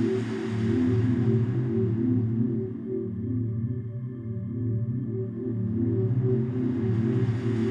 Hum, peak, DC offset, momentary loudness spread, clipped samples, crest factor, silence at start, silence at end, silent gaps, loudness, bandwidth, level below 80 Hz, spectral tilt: none; -12 dBFS; under 0.1%; 8 LU; under 0.1%; 14 dB; 0 s; 0 s; none; -27 LUFS; 7.2 kHz; -56 dBFS; -10 dB/octave